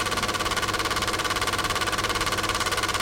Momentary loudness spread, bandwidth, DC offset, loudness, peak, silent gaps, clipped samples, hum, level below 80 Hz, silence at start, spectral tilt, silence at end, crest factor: 1 LU; 17 kHz; under 0.1%; -24 LUFS; -10 dBFS; none; under 0.1%; none; -42 dBFS; 0 s; -2 dB/octave; 0 s; 16 dB